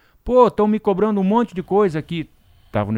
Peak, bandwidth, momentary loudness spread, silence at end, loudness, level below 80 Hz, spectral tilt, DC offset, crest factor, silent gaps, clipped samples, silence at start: -2 dBFS; 10 kHz; 13 LU; 0 s; -18 LUFS; -44 dBFS; -8.5 dB/octave; under 0.1%; 16 dB; none; under 0.1%; 0.25 s